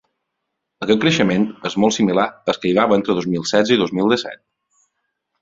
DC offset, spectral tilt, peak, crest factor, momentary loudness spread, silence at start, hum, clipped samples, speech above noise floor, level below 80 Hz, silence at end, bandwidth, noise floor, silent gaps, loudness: under 0.1%; -5 dB/octave; 0 dBFS; 18 dB; 6 LU; 0.8 s; none; under 0.1%; 60 dB; -56 dBFS; 1.05 s; 7.8 kHz; -77 dBFS; none; -18 LUFS